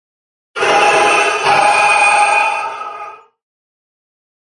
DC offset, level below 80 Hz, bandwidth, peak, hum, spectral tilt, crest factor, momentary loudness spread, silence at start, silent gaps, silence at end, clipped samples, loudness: under 0.1%; -60 dBFS; 11.5 kHz; 0 dBFS; none; -1 dB/octave; 14 dB; 18 LU; 0.55 s; none; 1.4 s; under 0.1%; -11 LUFS